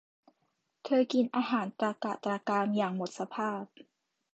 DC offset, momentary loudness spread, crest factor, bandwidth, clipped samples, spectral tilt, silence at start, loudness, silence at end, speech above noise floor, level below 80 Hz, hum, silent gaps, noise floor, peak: under 0.1%; 9 LU; 18 dB; 8.2 kHz; under 0.1%; -6 dB/octave; 0.85 s; -32 LUFS; 0.7 s; 48 dB; -82 dBFS; none; none; -79 dBFS; -16 dBFS